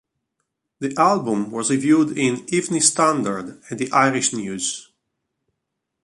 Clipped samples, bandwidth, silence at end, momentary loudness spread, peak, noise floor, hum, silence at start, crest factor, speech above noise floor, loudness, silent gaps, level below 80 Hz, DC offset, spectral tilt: under 0.1%; 11.5 kHz; 1.2 s; 12 LU; -2 dBFS; -79 dBFS; none; 0.8 s; 20 dB; 59 dB; -20 LUFS; none; -64 dBFS; under 0.1%; -3.5 dB/octave